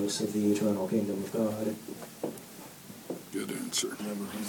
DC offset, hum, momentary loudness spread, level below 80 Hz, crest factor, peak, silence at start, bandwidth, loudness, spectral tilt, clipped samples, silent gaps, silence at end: under 0.1%; none; 16 LU; -76 dBFS; 16 dB; -16 dBFS; 0 s; 19 kHz; -32 LUFS; -4.5 dB/octave; under 0.1%; none; 0 s